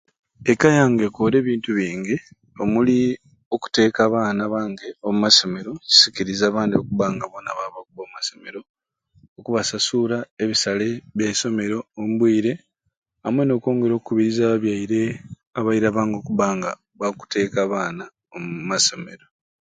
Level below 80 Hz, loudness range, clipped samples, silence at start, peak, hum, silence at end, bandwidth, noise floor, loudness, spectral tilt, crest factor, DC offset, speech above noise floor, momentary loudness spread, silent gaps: -58 dBFS; 7 LU; under 0.1%; 0.4 s; 0 dBFS; none; 0.5 s; 9.6 kHz; -58 dBFS; -20 LUFS; -4 dB/octave; 22 dB; under 0.1%; 38 dB; 15 LU; 3.46-3.51 s, 8.69-8.74 s, 9.28-9.36 s, 10.31-10.37 s, 12.97-13.02 s, 15.47-15.51 s